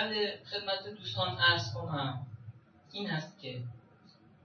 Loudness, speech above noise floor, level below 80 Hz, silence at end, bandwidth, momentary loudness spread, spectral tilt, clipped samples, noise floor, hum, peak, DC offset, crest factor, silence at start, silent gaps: -33 LUFS; 26 dB; -70 dBFS; 0.35 s; 7 kHz; 19 LU; -4.5 dB/octave; under 0.1%; -61 dBFS; none; -14 dBFS; under 0.1%; 22 dB; 0 s; none